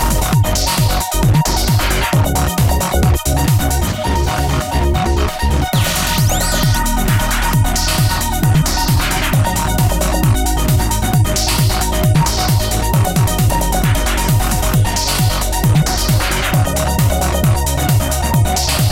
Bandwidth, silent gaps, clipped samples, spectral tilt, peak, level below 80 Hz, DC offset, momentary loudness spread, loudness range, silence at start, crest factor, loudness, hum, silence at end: 16.5 kHz; none; under 0.1%; -4.5 dB/octave; -4 dBFS; -20 dBFS; under 0.1%; 2 LU; 1 LU; 0 s; 10 dB; -15 LUFS; none; 0 s